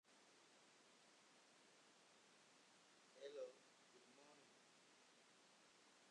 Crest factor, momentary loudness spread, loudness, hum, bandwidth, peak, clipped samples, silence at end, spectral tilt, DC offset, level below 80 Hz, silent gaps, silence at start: 22 dB; 13 LU; -61 LUFS; none; 10.5 kHz; -44 dBFS; under 0.1%; 0 s; -2 dB/octave; under 0.1%; under -90 dBFS; none; 0.05 s